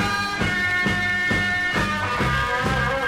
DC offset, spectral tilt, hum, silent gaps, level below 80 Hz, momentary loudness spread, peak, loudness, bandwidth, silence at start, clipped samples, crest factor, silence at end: under 0.1%; -4.5 dB/octave; none; none; -38 dBFS; 2 LU; -10 dBFS; -21 LUFS; 16.5 kHz; 0 s; under 0.1%; 12 dB; 0 s